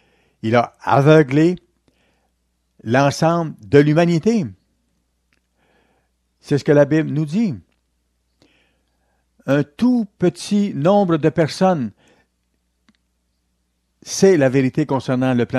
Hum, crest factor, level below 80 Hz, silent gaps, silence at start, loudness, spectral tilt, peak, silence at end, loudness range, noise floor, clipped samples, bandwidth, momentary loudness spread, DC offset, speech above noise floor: none; 18 dB; -56 dBFS; none; 0.45 s; -17 LUFS; -6.5 dB/octave; 0 dBFS; 0 s; 5 LU; -68 dBFS; under 0.1%; 12.5 kHz; 10 LU; under 0.1%; 52 dB